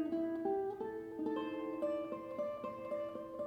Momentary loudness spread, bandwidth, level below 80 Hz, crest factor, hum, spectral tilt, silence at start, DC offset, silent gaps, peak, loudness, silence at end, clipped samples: 6 LU; 8.6 kHz; -74 dBFS; 14 dB; none; -7.5 dB/octave; 0 s; under 0.1%; none; -26 dBFS; -41 LUFS; 0 s; under 0.1%